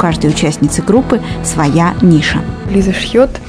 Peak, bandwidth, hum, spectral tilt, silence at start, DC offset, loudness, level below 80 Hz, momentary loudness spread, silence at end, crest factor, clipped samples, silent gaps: 0 dBFS; 11 kHz; none; -5.5 dB/octave; 0 s; under 0.1%; -12 LUFS; -28 dBFS; 6 LU; 0 s; 12 dB; 0.7%; none